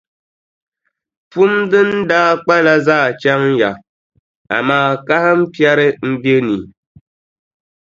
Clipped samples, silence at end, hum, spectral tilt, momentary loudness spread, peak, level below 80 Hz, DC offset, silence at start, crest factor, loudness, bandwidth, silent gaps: under 0.1%; 1.25 s; none; -6.5 dB/octave; 7 LU; 0 dBFS; -56 dBFS; under 0.1%; 1.35 s; 16 dB; -13 LUFS; 7.6 kHz; 3.89-4.10 s, 4.19-4.45 s